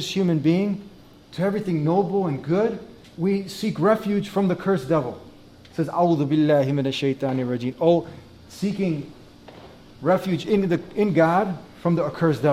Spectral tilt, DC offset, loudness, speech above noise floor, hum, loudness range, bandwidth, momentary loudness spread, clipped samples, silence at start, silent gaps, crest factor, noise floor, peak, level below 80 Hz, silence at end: -7.5 dB/octave; under 0.1%; -23 LUFS; 25 dB; none; 3 LU; 15 kHz; 10 LU; under 0.1%; 0 s; none; 16 dB; -46 dBFS; -6 dBFS; -56 dBFS; 0 s